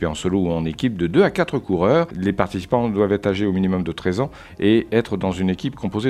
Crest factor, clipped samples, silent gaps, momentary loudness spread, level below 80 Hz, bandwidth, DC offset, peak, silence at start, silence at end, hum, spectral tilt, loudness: 20 dB; under 0.1%; none; 6 LU; -44 dBFS; 12.5 kHz; under 0.1%; 0 dBFS; 0 s; 0 s; none; -7 dB/octave; -20 LUFS